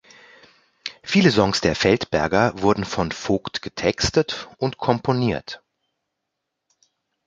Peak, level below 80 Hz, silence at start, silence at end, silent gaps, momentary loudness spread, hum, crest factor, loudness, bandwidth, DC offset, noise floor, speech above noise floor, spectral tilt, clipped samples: -2 dBFS; -46 dBFS; 0.85 s; 1.7 s; none; 13 LU; none; 22 dB; -21 LUFS; 9.2 kHz; under 0.1%; -80 dBFS; 60 dB; -5 dB/octave; under 0.1%